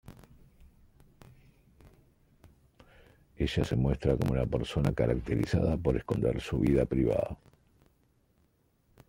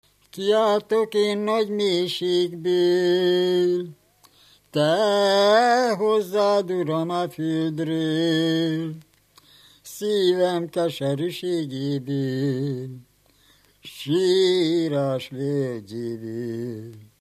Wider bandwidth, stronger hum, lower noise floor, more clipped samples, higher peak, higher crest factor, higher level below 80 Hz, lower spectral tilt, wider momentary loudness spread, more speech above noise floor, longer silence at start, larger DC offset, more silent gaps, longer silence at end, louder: about the same, 16 kHz vs 15 kHz; neither; first, -70 dBFS vs -59 dBFS; neither; second, -12 dBFS vs -4 dBFS; about the same, 20 dB vs 18 dB; first, -44 dBFS vs -70 dBFS; first, -8 dB/octave vs -5.5 dB/octave; second, 5 LU vs 12 LU; first, 41 dB vs 37 dB; second, 0.1 s vs 0.35 s; neither; neither; first, 1.75 s vs 0.15 s; second, -30 LUFS vs -22 LUFS